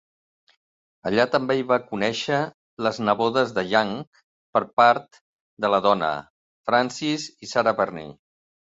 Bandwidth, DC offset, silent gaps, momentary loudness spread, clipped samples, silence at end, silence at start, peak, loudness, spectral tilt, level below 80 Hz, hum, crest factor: 8 kHz; under 0.1%; 2.54-2.77 s, 4.07-4.12 s, 4.24-4.53 s, 4.73-4.77 s, 5.21-5.57 s, 6.30-6.64 s; 11 LU; under 0.1%; 0.5 s; 1.05 s; -4 dBFS; -23 LUFS; -4.5 dB/octave; -64 dBFS; none; 20 dB